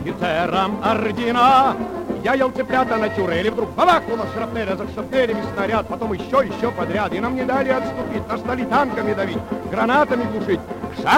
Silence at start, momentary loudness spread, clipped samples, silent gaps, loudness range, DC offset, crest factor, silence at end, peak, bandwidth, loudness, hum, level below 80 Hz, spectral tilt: 0 s; 9 LU; under 0.1%; none; 3 LU; under 0.1%; 18 dB; 0 s; -2 dBFS; 16.5 kHz; -20 LUFS; none; -46 dBFS; -6 dB/octave